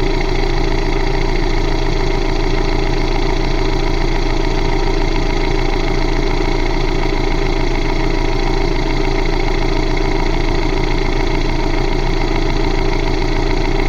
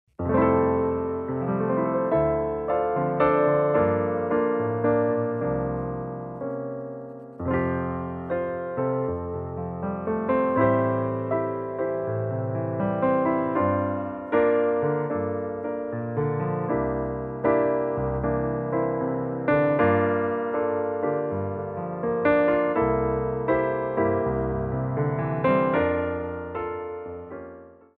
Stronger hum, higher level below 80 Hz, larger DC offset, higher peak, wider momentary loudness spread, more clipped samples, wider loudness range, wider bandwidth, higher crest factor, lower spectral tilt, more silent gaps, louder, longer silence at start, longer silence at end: neither; first, -16 dBFS vs -48 dBFS; neither; first, -2 dBFS vs -8 dBFS; second, 0 LU vs 10 LU; neither; second, 0 LU vs 4 LU; first, 7.2 kHz vs 4.2 kHz; about the same, 12 dB vs 16 dB; second, -6 dB/octave vs -11.5 dB/octave; neither; first, -18 LUFS vs -25 LUFS; second, 0 s vs 0.2 s; second, 0 s vs 0.3 s